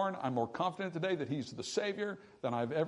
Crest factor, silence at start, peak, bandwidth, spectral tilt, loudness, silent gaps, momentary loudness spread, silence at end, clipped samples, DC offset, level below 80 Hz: 16 dB; 0 s; -20 dBFS; 11 kHz; -5.5 dB/octave; -37 LUFS; none; 5 LU; 0 s; under 0.1%; under 0.1%; -78 dBFS